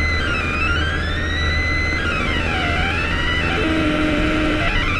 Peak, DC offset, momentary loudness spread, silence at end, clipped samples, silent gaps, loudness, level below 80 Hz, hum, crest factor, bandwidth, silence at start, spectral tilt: -6 dBFS; under 0.1%; 2 LU; 0 s; under 0.1%; none; -19 LUFS; -26 dBFS; none; 12 dB; 11.5 kHz; 0 s; -5.5 dB/octave